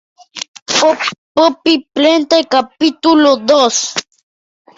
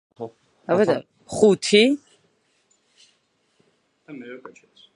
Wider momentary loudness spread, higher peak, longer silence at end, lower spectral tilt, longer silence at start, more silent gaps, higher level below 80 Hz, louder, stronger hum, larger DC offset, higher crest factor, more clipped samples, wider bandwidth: second, 13 LU vs 24 LU; first, 0 dBFS vs -4 dBFS; first, 0.75 s vs 0.45 s; second, -2 dB/octave vs -4.5 dB/octave; first, 0.35 s vs 0.2 s; first, 0.48-0.54 s, 0.62-0.66 s, 1.18-1.35 s vs none; first, -58 dBFS vs -66 dBFS; first, -12 LUFS vs -19 LUFS; neither; neither; second, 12 dB vs 22 dB; neither; second, 8 kHz vs 11.5 kHz